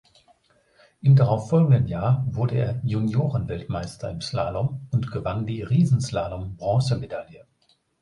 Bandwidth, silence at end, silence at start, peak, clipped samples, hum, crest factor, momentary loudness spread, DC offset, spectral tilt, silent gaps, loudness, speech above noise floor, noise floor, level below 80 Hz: 11 kHz; 0.6 s; 1.05 s; -8 dBFS; under 0.1%; none; 16 dB; 12 LU; under 0.1%; -8 dB/octave; none; -24 LUFS; 38 dB; -61 dBFS; -46 dBFS